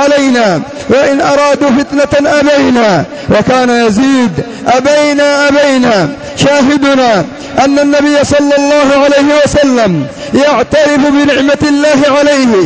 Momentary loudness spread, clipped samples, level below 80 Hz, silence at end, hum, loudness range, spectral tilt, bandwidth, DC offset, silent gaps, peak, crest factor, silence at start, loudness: 4 LU; under 0.1%; -36 dBFS; 0 s; none; 1 LU; -4.5 dB/octave; 8 kHz; 0.3%; none; 0 dBFS; 8 dB; 0 s; -8 LUFS